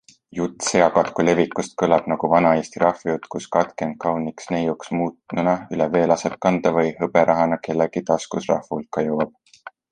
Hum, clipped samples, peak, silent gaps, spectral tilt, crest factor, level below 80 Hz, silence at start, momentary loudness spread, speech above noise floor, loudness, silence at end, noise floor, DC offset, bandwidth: none; under 0.1%; 0 dBFS; none; -5.5 dB/octave; 20 dB; -56 dBFS; 0.35 s; 9 LU; 24 dB; -21 LUFS; 0.25 s; -44 dBFS; under 0.1%; 10 kHz